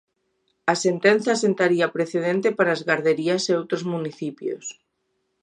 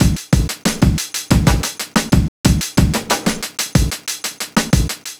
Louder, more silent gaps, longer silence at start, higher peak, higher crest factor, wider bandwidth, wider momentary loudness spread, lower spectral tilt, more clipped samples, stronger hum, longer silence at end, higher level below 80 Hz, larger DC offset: second, -22 LUFS vs -17 LUFS; second, none vs 2.28-2.44 s; first, 0.65 s vs 0 s; second, -4 dBFS vs 0 dBFS; about the same, 20 dB vs 16 dB; second, 10.5 kHz vs over 20 kHz; first, 11 LU vs 6 LU; about the same, -4.5 dB/octave vs -4.5 dB/octave; neither; neither; first, 0.7 s vs 0.05 s; second, -74 dBFS vs -22 dBFS; neither